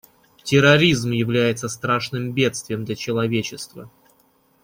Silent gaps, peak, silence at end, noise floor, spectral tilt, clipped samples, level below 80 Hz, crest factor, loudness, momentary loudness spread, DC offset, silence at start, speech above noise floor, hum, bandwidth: none; -2 dBFS; 0.75 s; -60 dBFS; -5 dB/octave; under 0.1%; -54 dBFS; 20 dB; -20 LUFS; 15 LU; under 0.1%; 0.45 s; 40 dB; none; 16.5 kHz